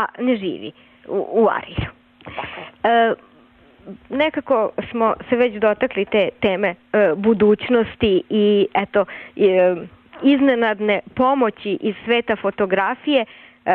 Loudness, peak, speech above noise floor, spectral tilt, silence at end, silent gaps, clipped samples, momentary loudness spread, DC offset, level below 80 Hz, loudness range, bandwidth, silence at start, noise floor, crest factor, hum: -19 LUFS; -6 dBFS; 32 dB; -8.5 dB/octave; 0 s; none; under 0.1%; 13 LU; under 0.1%; -50 dBFS; 4 LU; 4.4 kHz; 0 s; -51 dBFS; 14 dB; none